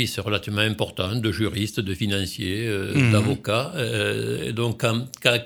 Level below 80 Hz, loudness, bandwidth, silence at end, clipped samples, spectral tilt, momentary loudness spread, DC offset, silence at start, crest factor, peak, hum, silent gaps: -52 dBFS; -24 LUFS; 18 kHz; 0 s; under 0.1%; -5 dB/octave; 6 LU; under 0.1%; 0 s; 22 dB; -2 dBFS; none; none